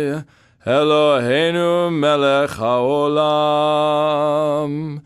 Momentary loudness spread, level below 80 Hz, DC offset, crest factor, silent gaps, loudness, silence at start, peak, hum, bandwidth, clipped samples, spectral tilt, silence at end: 6 LU; -58 dBFS; under 0.1%; 14 dB; none; -17 LUFS; 0 s; -4 dBFS; none; 13.5 kHz; under 0.1%; -6 dB/octave; 0.05 s